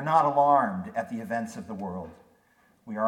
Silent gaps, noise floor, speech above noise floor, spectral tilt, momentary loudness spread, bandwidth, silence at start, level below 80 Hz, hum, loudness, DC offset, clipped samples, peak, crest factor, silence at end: none; -64 dBFS; 38 dB; -7 dB/octave; 18 LU; 13.5 kHz; 0 s; -68 dBFS; none; -27 LUFS; under 0.1%; under 0.1%; -8 dBFS; 20 dB; 0 s